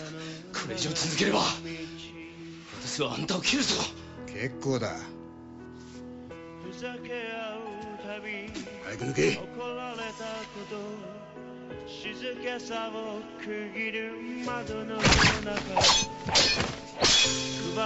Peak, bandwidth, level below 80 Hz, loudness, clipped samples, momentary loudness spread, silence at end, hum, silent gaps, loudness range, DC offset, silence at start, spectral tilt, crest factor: -10 dBFS; 8.4 kHz; -48 dBFS; -28 LUFS; under 0.1%; 22 LU; 0 s; none; none; 13 LU; under 0.1%; 0 s; -2.5 dB/octave; 20 dB